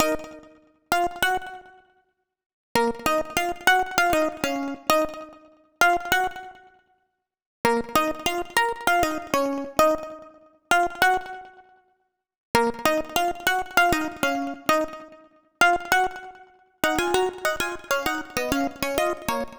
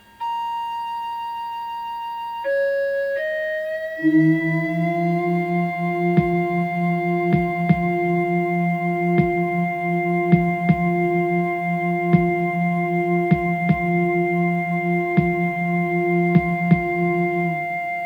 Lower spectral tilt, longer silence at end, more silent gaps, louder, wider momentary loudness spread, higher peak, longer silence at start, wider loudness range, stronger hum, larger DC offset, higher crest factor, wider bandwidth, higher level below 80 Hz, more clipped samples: second, -3 dB/octave vs -9 dB/octave; about the same, 0 s vs 0 s; first, 2.46-2.75 s, 7.46-7.64 s, 12.38-12.54 s vs none; about the same, -23 LUFS vs -21 LUFS; first, 11 LU vs 8 LU; about the same, -2 dBFS vs -2 dBFS; second, 0 s vs 0.2 s; about the same, 3 LU vs 2 LU; neither; neither; first, 24 dB vs 18 dB; first, over 20 kHz vs 5 kHz; about the same, -50 dBFS vs -48 dBFS; neither